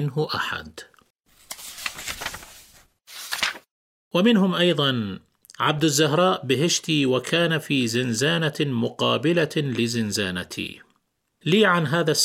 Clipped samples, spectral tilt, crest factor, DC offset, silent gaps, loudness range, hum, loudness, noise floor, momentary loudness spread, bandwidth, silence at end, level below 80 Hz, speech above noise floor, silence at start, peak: under 0.1%; -4 dB/octave; 18 dB; under 0.1%; 1.10-1.15 s, 3.71-4.11 s; 10 LU; none; -22 LUFS; -71 dBFS; 15 LU; 16.5 kHz; 0 s; -60 dBFS; 49 dB; 0 s; -6 dBFS